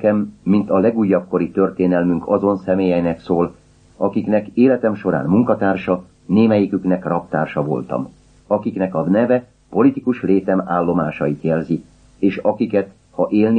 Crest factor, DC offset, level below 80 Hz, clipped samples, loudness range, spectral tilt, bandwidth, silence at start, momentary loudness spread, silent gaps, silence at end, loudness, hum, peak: 16 dB; under 0.1%; -52 dBFS; under 0.1%; 2 LU; -10 dB/octave; 5.6 kHz; 0 s; 7 LU; none; 0 s; -18 LUFS; none; -2 dBFS